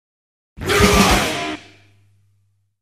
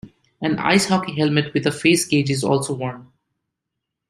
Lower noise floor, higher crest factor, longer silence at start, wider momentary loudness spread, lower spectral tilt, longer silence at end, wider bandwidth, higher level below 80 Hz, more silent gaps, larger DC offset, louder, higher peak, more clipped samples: second, -64 dBFS vs -81 dBFS; about the same, 20 dB vs 20 dB; first, 0.6 s vs 0.05 s; first, 17 LU vs 9 LU; about the same, -3.5 dB/octave vs -4.5 dB/octave; first, 1.25 s vs 1.05 s; about the same, 15.5 kHz vs 15 kHz; first, -30 dBFS vs -58 dBFS; neither; neither; first, -16 LUFS vs -19 LUFS; about the same, 0 dBFS vs -2 dBFS; neither